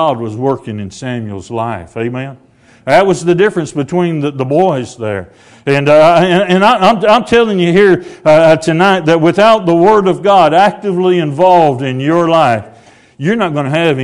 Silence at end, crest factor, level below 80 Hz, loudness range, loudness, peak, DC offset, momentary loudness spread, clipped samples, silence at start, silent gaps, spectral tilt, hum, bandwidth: 0 s; 10 dB; -48 dBFS; 6 LU; -10 LUFS; 0 dBFS; under 0.1%; 13 LU; 1%; 0 s; none; -6 dB/octave; none; 12 kHz